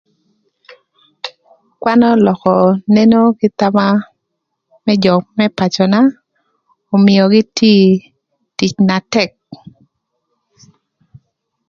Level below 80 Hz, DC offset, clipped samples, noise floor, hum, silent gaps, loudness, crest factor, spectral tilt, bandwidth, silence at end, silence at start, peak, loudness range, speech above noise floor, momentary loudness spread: -54 dBFS; under 0.1%; under 0.1%; -73 dBFS; none; none; -12 LUFS; 14 dB; -6.5 dB/octave; 7.2 kHz; 2.15 s; 1.25 s; 0 dBFS; 4 LU; 62 dB; 11 LU